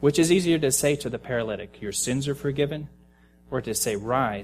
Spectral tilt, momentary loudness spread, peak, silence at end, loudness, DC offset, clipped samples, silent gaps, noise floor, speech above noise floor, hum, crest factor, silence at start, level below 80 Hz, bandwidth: -4.5 dB/octave; 12 LU; -8 dBFS; 0 s; -25 LUFS; under 0.1%; under 0.1%; none; -56 dBFS; 31 dB; none; 18 dB; 0 s; -52 dBFS; 15.5 kHz